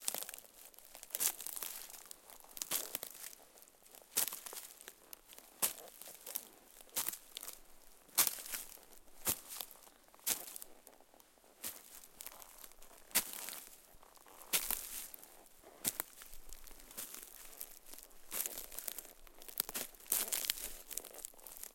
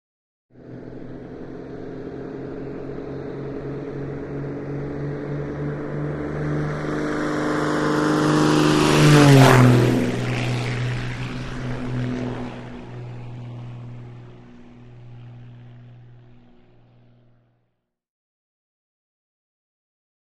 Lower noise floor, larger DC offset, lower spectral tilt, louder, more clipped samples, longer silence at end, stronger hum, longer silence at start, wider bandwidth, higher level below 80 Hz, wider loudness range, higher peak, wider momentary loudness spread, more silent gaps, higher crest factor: second, -65 dBFS vs -74 dBFS; neither; second, 0.5 dB/octave vs -6 dB/octave; second, -40 LUFS vs -21 LUFS; neither; second, 0 s vs 4 s; second, none vs 60 Hz at -55 dBFS; second, 0 s vs 0.55 s; first, 17 kHz vs 14.5 kHz; second, -66 dBFS vs -44 dBFS; second, 6 LU vs 21 LU; second, -8 dBFS vs 0 dBFS; about the same, 21 LU vs 23 LU; neither; first, 36 dB vs 22 dB